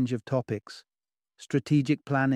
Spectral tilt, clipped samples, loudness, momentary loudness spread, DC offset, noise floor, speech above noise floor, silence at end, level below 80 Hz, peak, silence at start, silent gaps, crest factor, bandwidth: -7.5 dB/octave; under 0.1%; -28 LUFS; 16 LU; under 0.1%; -73 dBFS; 46 dB; 0 s; -68 dBFS; -12 dBFS; 0 s; none; 16 dB; 11 kHz